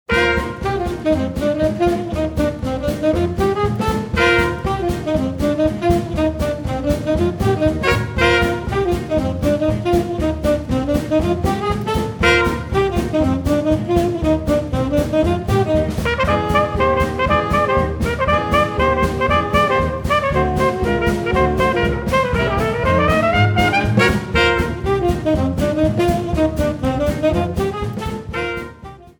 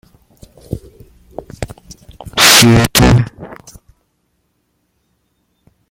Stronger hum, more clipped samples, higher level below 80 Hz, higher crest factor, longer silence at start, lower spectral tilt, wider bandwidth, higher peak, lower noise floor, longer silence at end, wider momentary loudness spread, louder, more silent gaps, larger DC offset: neither; second, under 0.1% vs 0.1%; about the same, -28 dBFS vs -30 dBFS; about the same, 16 dB vs 16 dB; second, 0.1 s vs 0.7 s; first, -6.5 dB/octave vs -3.5 dB/octave; about the same, 19 kHz vs over 20 kHz; about the same, -2 dBFS vs 0 dBFS; second, -37 dBFS vs -64 dBFS; second, 0.15 s vs 2.35 s; second, 6 LU vs 28 LU; second, -18 LUFS vs -8 LUFS; neither; neither